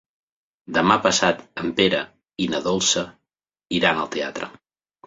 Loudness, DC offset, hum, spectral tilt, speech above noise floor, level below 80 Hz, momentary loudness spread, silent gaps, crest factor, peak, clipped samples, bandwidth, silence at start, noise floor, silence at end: -21 LUFS; under 0.1%; none; -3 dB/octave; 62 dB; -56 dBFS; 13 LU; none; 22 dB; -2 dBFS; under 0.1%; 8 kHz; 0.7 s; -83 dBFS; 0.55 s